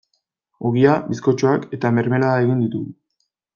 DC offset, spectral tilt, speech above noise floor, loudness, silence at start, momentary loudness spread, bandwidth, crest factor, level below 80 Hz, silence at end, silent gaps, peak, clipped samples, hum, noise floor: under 0.1%; -8 dB/octave; 55 dB; -19 LUFS; 0.6 s; 9 LU; 7.2 kHz; 18 dB; -60 dBFS; 0.65 s; none; -2 dBFS; under 0.1%; none; -73 dBFS